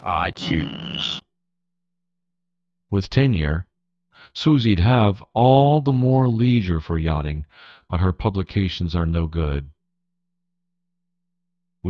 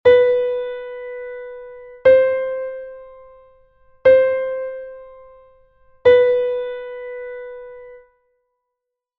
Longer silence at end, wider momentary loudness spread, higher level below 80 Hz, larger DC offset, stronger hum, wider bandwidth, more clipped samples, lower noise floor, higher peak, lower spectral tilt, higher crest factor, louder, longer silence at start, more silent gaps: second, 0 s vs 1.2 s; second, 12 LU vs 23 LU; first, -38 dBFS vs -54 dBFS; neither; first, 50 Hz at -40 dBFS vs none; first, 7.2 kHz vs 4.3 kHz; neither; about the same, -81 dBFS vs -82 dBFS; about the same, -2 dBFS vs -2 dBFS; first, -8 dB/octave vs -6 dB/octave; about the same, 18 dB vs 18 dB; second, -20 LUFS vs -17 LUFS; about the same, 0.05 s vs 0.05 s; neither